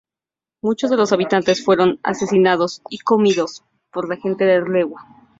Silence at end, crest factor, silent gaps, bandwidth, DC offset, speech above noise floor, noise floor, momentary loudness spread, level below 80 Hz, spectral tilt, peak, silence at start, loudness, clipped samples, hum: 0.35 s; 16 dB; none; 7.8 kHz; under 0.1%; 72 dB; -90 dBFS; 10 LU; -62 dBFS; -5.5 dB/octave; -2 dBFS; 0.65 s; -18 LUFS; under 0.1%; none